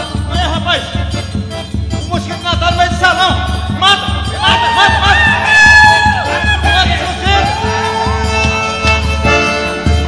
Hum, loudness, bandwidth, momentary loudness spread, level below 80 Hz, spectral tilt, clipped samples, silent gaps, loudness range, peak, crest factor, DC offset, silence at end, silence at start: none; -11 LUFS; 11 kHz; 11 LU; -20 dBFS; -4 dB/octave; 0.3%; none; 6 LU; 0 dBFS; 12 dB; under 0.1%; 0 s; 0 s